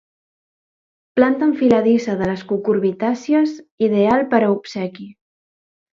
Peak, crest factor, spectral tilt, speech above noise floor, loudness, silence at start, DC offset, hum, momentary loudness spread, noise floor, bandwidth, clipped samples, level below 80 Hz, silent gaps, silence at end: 0 dBFS; 18 dB; -7 dB/octave; over 73 dB; -18 LUFS; 1.15 s; under 0.1%; none; 9 LU; under -90 dBFS; 7.6 kHz; under 0.1%; -56 dBFS; 3.71-3.78 s; 0.8 s